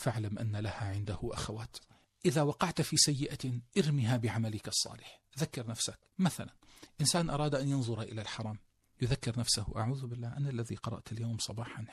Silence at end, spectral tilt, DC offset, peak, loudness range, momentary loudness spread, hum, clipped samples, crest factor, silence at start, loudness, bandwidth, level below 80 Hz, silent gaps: 0 s; -4.5 dB/octave; under 0.1%; -10 dBFS; 4 LU; 11 LU; none; under 0.1%; 24 dB; 0 s; -34 LUFS; 13.5 kHz; -56 dBFS; none